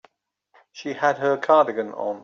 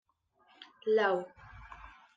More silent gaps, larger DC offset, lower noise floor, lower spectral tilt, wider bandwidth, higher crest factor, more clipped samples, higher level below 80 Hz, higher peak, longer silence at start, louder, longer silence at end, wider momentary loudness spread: neither; neither; about the same, -66 dBFS vs -69 dBFS; about the same, -5.5 dB/octave vs -5.5 dB/octave; about the same, 7.2 kHz vs 7.6 kHz; about the same, 18 dB vs 20 dB; neither; second, -74 dBFS vs -62 dBFS; first, -6 dBFS vs -14 dBFS; first, 0.75 s vs 0.6 s; first, -21 LUFS vs -31 LUFS; second, 0 s vs 0.25 s; second, 14 LU vs 23 LU